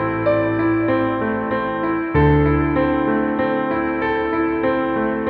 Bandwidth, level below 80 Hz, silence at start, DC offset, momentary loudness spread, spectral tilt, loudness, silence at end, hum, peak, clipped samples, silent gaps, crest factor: 4.8 kHz; -34 dBFS; 0 s; under 0.1%; 5 LU; -10.5 dB/octave; -19 LUFS; 0 s; none; -4 dBFS; under 0.1%; none; 14 dB